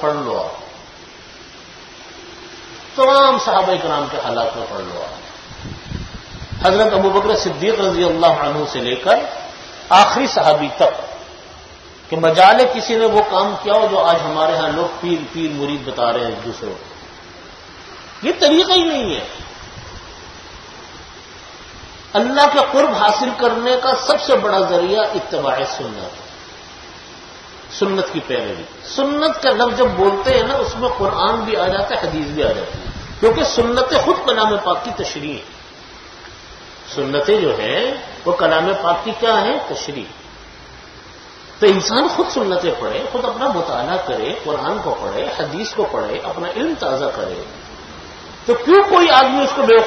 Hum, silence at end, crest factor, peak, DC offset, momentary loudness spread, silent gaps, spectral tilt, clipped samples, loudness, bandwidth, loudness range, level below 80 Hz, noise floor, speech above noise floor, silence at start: none; 0 s; 18 dB; 0 dBFS; under 0.1%; 23 LU; none; -4 dB/octave; under 0.1%; -16 LUFS; 11 kHz; 7 LU; -44 dBFS; -39 dBFS; 23 dB; 0 s